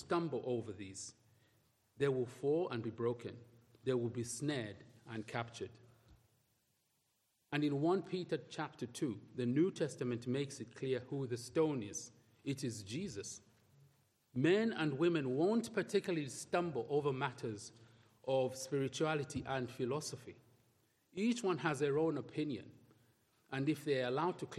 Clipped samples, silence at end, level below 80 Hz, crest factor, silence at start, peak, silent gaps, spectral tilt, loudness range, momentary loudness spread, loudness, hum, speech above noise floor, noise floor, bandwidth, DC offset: under 0.1%; 0 s; -76 dBFS; 20 dB; 0 s; -18 dBFS; none; -5.5 dB/octave; 6 LU; 13 LU; -39 LUFS; none; 43 dB; -81 dBFS; 13.5 kHz; under 0.1%